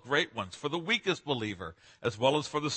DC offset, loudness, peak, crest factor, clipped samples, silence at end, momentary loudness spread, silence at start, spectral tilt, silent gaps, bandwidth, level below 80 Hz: under 0.1%; -31 LUFS; -10 dBFS; 22 dB; under 0.1%; 0 s; 9 LU; 0.05 s; -4 dB/octave; none; 8.8 kHz; -66 dBFS